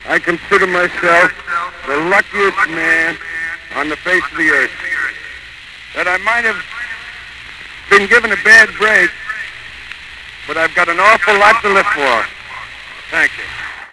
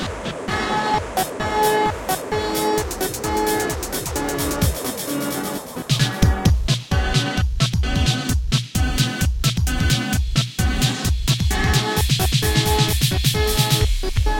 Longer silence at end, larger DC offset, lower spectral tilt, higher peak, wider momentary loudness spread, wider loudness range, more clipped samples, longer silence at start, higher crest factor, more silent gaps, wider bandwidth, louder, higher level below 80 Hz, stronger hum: about the same, 0.05 s vs 0 s; first, 0.1% vs under 0.1%; second, -3 dB/octave vs -4.5 dB/octave; first, 0 dBFS vs -4 dBFS; first, 21 LU vs 6 LU; about the same, 5 LU vs 4 LU; first, 0.5% vs under 0.1%; about the same, 0 s vs 0 s; about the same, 14 dB vs 16 dB; neither; second, 11 kHz vs 17 kHz; first, -12 LUFS vs -20 LUFS; second, -46 dBFS vs -26 dBFS; neither